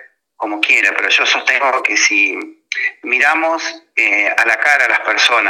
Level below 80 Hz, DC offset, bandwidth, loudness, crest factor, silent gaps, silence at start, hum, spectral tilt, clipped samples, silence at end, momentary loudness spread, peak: -72 dBFS; under 0.1%; 17 kHz; -12 LUFS; 14 dB; none; 0 s; none; 1.5 dB/octave; under 0.1%; 0 s; 8 LU; 0 dBFS